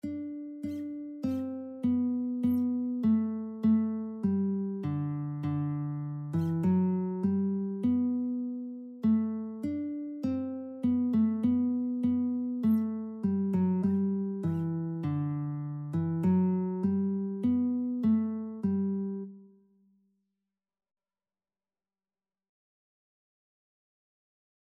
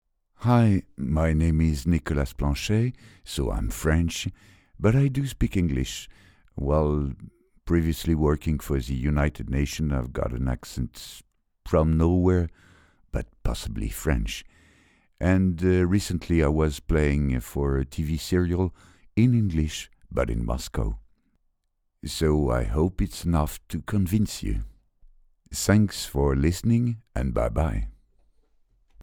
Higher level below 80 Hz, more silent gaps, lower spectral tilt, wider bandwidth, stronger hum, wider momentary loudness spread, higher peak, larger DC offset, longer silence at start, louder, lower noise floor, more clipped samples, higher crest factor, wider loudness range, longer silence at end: second, -68 dBFS vs -34 dBFS; neither; first, -11 dB/octave vs -6.5 dB/octave; second, 4.5 kHz vs 19 kHz; neither; second, 9 LU vs 12 LU; second, -16 dBFS vs -4 dBFS; neither; second, 0.05 s vs 0.4 s; second, -31 LUFS vs -26 LUFS; first, under -90 dBFS vs -74 dBFS; neither; second, 14 dB vs 20 dB; about the same, 3 LU vs 4 LU; first, 5.25 s vs 0 s